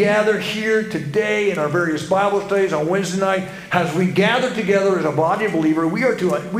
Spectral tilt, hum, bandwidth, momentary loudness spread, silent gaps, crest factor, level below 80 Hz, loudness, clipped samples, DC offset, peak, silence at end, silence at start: -5.5 dB/octave; none; 15.5 kHz; 4 LU; none; 18 dB; -56 dBFS; -19 LUFS; under 0.1%; under 0.1%; 0 dBFS; 0 s; 0 s